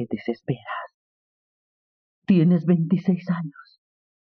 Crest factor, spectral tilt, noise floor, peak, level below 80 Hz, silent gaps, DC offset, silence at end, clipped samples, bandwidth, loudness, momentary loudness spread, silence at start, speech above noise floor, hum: 18 dB; -8.5 dB/octave; under -90 dBFS; -8 dBFS; -66 dBFS; 0.94-2.22 s; under 0.1%; 0.7 s; under 0.1%; 5.4 kHz; -23 LUFS; 17 LU; 0 s; over 68 dB; none